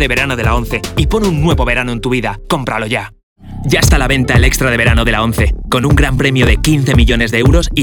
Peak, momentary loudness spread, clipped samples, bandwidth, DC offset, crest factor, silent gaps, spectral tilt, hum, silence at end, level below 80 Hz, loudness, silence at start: 0 dBFS; 7 LU; under 0.1%; 20 kHz; 0.2%; 12 dB; 3.23-3.36 s; -5 dB/octave; none; 0 s; -18 dBFS; -12 LUFS; 0 s